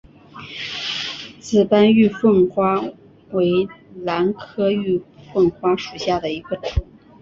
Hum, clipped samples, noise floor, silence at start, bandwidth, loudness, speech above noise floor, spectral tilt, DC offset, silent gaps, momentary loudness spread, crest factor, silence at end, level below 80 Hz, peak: none; under 0.1%; -39 dBFS; 0.35 s; 7.6 kHz; -20 LUFS; 21 dB; -6.5 dB/octave; under 0.1%; none; 14 LU; 16 dB; 0.4 s; -38 dBFS; -2 dBFS